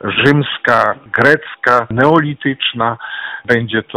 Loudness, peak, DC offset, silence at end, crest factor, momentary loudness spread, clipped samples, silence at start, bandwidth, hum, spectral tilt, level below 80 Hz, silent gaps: -14 LUFS; 0 dBFS; 0.1%; 0.05 s; 14 dB; 7 LU; 0.2%; 0.05 s; 13.5 kHz; none; -6.5 dB/octave; -50 dBFS; none